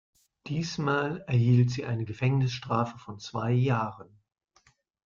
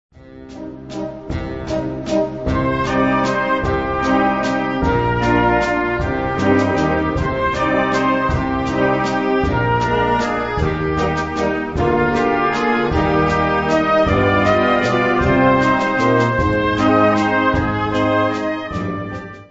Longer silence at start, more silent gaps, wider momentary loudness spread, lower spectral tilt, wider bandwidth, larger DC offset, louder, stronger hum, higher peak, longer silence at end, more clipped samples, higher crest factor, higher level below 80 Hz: first, 0.45 s vs 0.2 s; neither; first, 12 LU vs 9 LU; about the same, -7 dB/octave vs -6.5 dB/octave; second, 7.2 kHz vs 8 kHz; second, under 0.1% vs 0.4%; second, -28 LUFS vs -17 LUFS; neither; second, -12 dBFS vs -2 dBFS; first, 1.05 s vs 0.05 s; neither; about the same, 16 dB vs 14 dB; second, -62 dBFS vs -32 dBFS